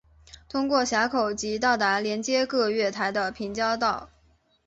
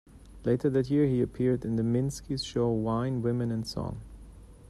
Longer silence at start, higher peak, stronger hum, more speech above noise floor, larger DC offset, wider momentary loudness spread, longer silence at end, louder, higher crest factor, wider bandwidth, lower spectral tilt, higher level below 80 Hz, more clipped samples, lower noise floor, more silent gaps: first, 0.55 s vs 0.15 s; first, -10 dBFS vs -14 dBFS; neither; first, 38 dB vs 21 dB; neither; second, 6 LU vs 9 LU; first, 0.6 s vs 0 s; first, -25 LUFS vs -29 LUFS; about the same, 18 dB vs 14 dB; second, 8.2 kHz vs 13 kHz; second, -3 dB/octave vs -7.5 dB/octave; second, -58 dBFS vs -50 dBFS; neither; first, -63 dBFS vs -49 dBFS; neither